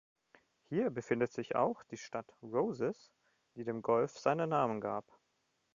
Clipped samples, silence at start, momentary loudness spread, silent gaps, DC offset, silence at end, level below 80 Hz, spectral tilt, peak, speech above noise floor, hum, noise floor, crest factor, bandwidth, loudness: under 0.1%; 0.7 s; 12 LU; none; under 0.1%; 0.75 s; -76 dBFS; -6 dB/octave; -16 dBFS; 44 dB; none; -80 dBFS; 22 dB; 7.4 kHz; -36 LUFS